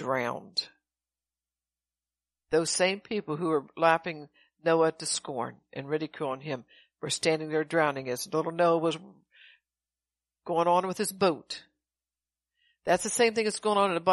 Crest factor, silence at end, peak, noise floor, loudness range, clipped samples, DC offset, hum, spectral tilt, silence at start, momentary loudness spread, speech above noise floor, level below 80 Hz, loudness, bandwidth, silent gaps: 22 dB; 0 s; -8 dBFS; under -90 dBFS; 3 LU; under 0.1%; under 0.1%; none; -3.5 dB/octave; 0 s; 13 LU; over 62 dB; -72 dBFS; -28 LUFS; 12 kHz; none